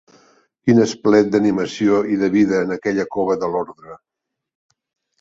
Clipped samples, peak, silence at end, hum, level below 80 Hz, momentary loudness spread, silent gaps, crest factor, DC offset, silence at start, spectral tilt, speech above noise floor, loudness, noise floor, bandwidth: under 0.1%; -2 dBFS; 1.25 s; none; -56 dBFS; 8 LU; none; 18 dB; under 0.1%; 0.65 s; -6.5 dB/octave; 39 dB; -18 LUFS; -56 dBFS; 7.8 kHz